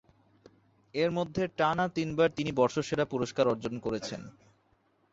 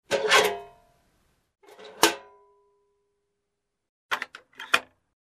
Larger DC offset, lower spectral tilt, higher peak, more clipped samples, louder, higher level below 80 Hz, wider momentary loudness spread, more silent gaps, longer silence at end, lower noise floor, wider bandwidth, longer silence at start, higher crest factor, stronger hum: neither; first, -5.5 dB/octave vs -0.5 dB/octave; second, -12 dBFS vs -2 dBFS; neither; second, -30 LUFS vs -24 LUFS; first, -62 dBFS vs -70 dBFS; second, 9 LU vs 19 LU; second, none vs 3.89-4.09 s; first, 0.85 s vs 0.45 s; second, -70 dBFS vs -82 dBFS; second, 8 kHz vs 14 kHz; first, 0.95 s vs 0.1 s; second, 20 dB vs 28 dB; neither